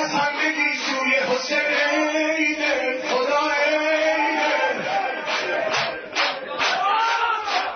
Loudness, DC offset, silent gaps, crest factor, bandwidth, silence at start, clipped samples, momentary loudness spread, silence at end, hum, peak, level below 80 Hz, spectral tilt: -21 LUFS; under 0.1%; none; 16 dB; 6.6 kHz; 0 s; under 0.1%; 4 LU; 0 s; none; -6 dBFS; -66 dBFS; -2 dB/octave